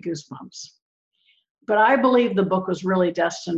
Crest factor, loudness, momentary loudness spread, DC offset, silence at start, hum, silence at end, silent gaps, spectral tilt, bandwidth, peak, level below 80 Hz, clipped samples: 16 dB; -20 LUFS; 22 LU; under 0.1%; 0.05 s; none; 0 s; 0.82-1.11 s, 1.50-1.55 s; -5.5 dB/octave; 8 kHz; -6 dBFS; -66 dBFS; under 0.1%